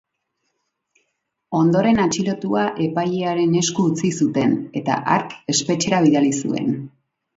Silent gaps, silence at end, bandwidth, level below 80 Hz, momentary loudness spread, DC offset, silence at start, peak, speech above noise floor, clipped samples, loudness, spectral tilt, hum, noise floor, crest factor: none; 0.5 s; 8 kHz; -56 dBFS; 7 LU; under 0.1%; 1.5 s; -2 dBFS; 55 dB; under 0.1%; -19 LUFS; -5 dB/octave; none; -74 dBFS; 18 dB